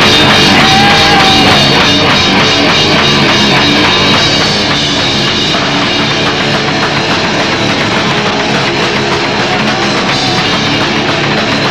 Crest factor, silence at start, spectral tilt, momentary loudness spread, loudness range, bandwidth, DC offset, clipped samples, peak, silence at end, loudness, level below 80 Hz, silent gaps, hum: 8 dB; 0 s; -3.5 dB/octave; 6 LU; 5 LU; 16 kHz; under 0.1%; 0.4%; 0 dBFS; 0 s; -7 LUFS; -32 dBFS; none; none